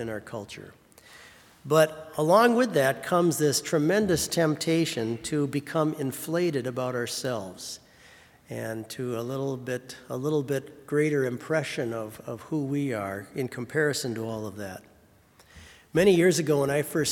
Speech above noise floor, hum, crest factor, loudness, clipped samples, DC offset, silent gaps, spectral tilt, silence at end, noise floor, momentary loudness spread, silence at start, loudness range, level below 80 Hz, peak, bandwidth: 32 dB; none; 22 dB; -27 LUFS; under 0.1%; under 0.1%; none; -5 dB/octave; 0 s; -58 dBFS; 15 LU; 0 s; 9 LU; -62 dBFS; -6 dBFS; 18 kHz